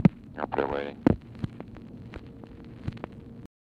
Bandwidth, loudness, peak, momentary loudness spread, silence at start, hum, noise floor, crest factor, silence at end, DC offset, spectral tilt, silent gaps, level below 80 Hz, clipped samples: 7.2 kHz; -31 LUFS; -8 dBFS; 19 LU; 0 s; none; -45 dBFS; 24 dB; 0.15 s; under 0.1%; -9.5 dB/octave; none; -48 dBFS; under 0.1%